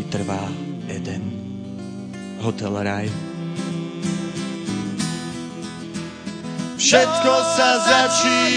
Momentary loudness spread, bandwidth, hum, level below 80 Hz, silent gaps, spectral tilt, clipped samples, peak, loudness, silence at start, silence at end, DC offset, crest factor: 17 LU; 10.5 kHz; none; -58 dBFS; none; -3.5 dB/octave; under 0.1%; 0 dBFS; -21 LUFS; 0 s; 0 s; under 0.1%; 20 dB